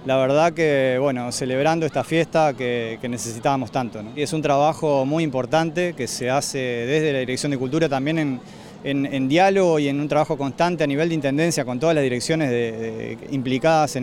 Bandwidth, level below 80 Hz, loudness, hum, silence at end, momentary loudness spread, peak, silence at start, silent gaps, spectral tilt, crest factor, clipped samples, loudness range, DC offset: 16.5 kHz; -56 dBFS; -21 LUFS; none; 0 s; 8 LU; -6 dBFS; 0 s; none; -5.5 dB/octave; 16 dB; under 0.1%; 2 LU; under 0.1%